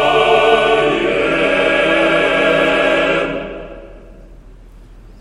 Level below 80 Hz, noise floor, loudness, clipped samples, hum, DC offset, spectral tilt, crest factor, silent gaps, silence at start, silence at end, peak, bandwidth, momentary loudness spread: -38 dBFS; -38 dBFS; -13 LUFS; under 0.1%; none; under 0.1%; -4.5 dB/octave; 14 dB; none; 0 s; 0.2 s; 0 dBFS; 11.5 kHz; 12 LU